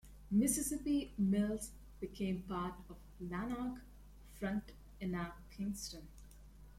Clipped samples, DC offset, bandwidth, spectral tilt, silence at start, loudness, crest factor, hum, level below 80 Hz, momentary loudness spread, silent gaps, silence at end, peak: under 0.1%; under 0.1%; 16 kHz; -5 dB/octave; 0.05 s; -40 LUFS; 18 dB; 50 Hz at -55 dBFS; -56 dBFS; 20 LU; none; 0 s; -22 dBFS